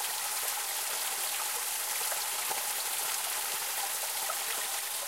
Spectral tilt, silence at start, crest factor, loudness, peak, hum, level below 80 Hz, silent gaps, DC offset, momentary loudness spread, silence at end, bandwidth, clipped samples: 3 dB/octave; 0 s; 16 dB; -31 LUFS; -18 dBFS; none; -82 dBFS; none; under 0.1%; 1 LU; 0 s; 16 kHz; under 0.1%